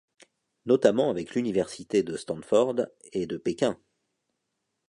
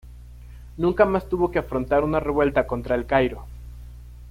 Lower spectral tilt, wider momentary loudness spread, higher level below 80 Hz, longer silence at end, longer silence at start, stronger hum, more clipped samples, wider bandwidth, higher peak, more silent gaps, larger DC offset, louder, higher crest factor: second, -5.5 dB/octave vs -8 dB/octave; second, 11 LU vs 22 LU; second, -66 dBFS vs -38 dBFS; first, 1.15 s vs 0 s; first, 0.65 s vs 0.05 s; second, none vs 60 Hz at -35 dBFS; neither; second, 11 kHz vs 15.5 kHz; about the same, -6 dBFS vs -4 dBFS; neither; neither; second, -27 LUFS vs -22 LUFS; about the same, 22 dB vs 20 dB